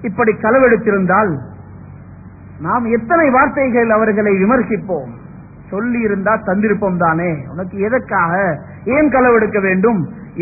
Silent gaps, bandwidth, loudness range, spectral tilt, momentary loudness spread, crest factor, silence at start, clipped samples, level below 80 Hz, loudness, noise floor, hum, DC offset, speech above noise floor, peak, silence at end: none; 2.7 kHz; 2 LU; -16.5 dB/octave; 12 LU; 14 dB; 0 s; under 0.1%; -42 dBFS; -14 LUFS; -36 dBFS; none; under 0.1%; 22 dB; 0 dBFS; 0 s